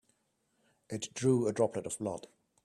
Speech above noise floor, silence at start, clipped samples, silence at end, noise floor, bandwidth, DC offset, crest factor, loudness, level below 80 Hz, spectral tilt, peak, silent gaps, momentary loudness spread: 45 dB; 0.9 s; under 0.1%; 0.45 s; -77 dBFS; 13 kHz; under 0.1%; 18 dB; -33 LUFS; -72 dBFS; -5.5 dB/octave; -16 dBFS; none; 13 LU